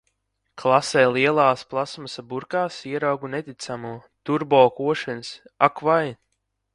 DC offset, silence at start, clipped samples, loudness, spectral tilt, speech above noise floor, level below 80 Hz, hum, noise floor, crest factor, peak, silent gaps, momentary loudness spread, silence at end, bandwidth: under 0.1%; 0.55 s; under 0.1%; -22 LUFS; -5 dB/octave; 53 dB; -66 dBFS; none; -75 dBFS; 22 dB; 0 dBFS; none; 15 LU; 0.6 s; 11.5 kHz